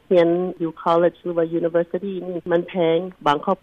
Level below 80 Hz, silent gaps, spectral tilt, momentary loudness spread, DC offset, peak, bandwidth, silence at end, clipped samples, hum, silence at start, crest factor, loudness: -60 dBFS; none; -8 dB/octave; 8 LU; under 0.1%; -6 dBFS; 7 kHz; 0.05 s; under 0.1%; none; 0.1 s; 14 dB; -21 LUFS